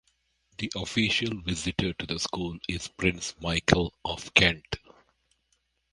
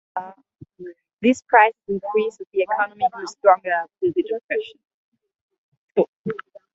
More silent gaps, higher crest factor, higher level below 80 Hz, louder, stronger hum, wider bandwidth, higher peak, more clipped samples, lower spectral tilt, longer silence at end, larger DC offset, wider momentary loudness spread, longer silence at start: second, none vs 1.13-1.17 s, 2.47-2.51 s, 4.43-4.49 s, 4.94-5.12 s, 5.41-5.49 s, 5.58-5.88 s, 6.08-6.24 s; first, 28 dB vs 22 dB; first, -46 dBFS vs -68 dBFS; second, -27 LUFS vs -21 LUFS; neither; first, 11.5 kHz vs 8 kHz; about the same, -2 dBFS vs 0 dBFS; neither; second, -4 dB/octave vs -5.5 dB/octave; first, 1.15 s vs 0.35 s; neither; second, 13 LU vs 22 LU; first, 0.6 s vs 0.15 s